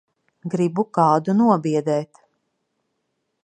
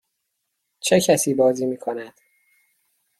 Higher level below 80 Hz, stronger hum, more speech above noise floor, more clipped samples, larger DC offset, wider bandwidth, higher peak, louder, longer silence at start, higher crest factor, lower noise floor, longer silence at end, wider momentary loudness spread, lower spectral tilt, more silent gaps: second, -72 dBFS vs -64 dBFS; neither; about the same, 55 dB vs 57 dB; neither; neither; second, 9.8 kHz vs 15.5 kHz; about the same, -4 dBFS vs -4 dBFS; about the same, -20 LUFS vs -20 LUFS; second, 0.45 s vs 0.85 s; about the same, 18 dB vs 20 dB; about the same, -75 dBFS vs -76 dBFS; first, 1.4 s vs 1.1 s; second, 12 LU vs 15 LU; first, -8 dB/octave vs -4 dB/octave; neither